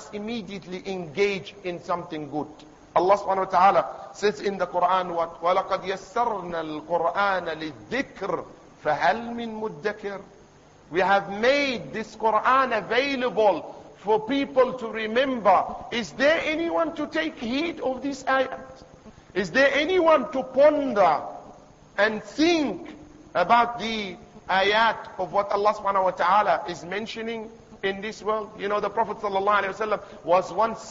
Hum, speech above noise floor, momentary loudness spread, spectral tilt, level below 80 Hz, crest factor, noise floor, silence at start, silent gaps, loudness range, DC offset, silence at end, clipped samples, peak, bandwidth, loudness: none; 28 dB; 13 LU; -4.5 dB/octave; -58 dBFS; 18 dB; -52 dBFS; 0 s; none; 5 LU; under 0.1%; 0 s; under 0.1%; -6 dBFS; 7.8 kHz; -24 LUFS